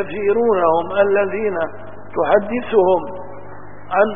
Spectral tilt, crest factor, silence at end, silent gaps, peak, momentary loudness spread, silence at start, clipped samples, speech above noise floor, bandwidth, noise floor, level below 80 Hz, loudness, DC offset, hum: -11 dB/octave; 18 dB; 0 s; none; -2 dBFS; 21 LU; 0 s; under 0.1%; 21 dB; 3.7 kHz; -38 dBFS; -52 dBFS; -18 LUFS; 3%; none